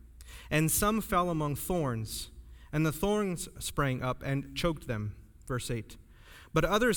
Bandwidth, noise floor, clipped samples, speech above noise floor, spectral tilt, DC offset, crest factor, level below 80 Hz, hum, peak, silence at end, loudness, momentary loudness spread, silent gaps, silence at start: over 20 kHz; -53 dBFS; under 0.1%; 23 dB; -5 dB/octave; under 0.1%; 18 dB; -46 dBFS; none; -14 dBFS; 0 s; -32 LUFS; 12 LU; none; 0.05 s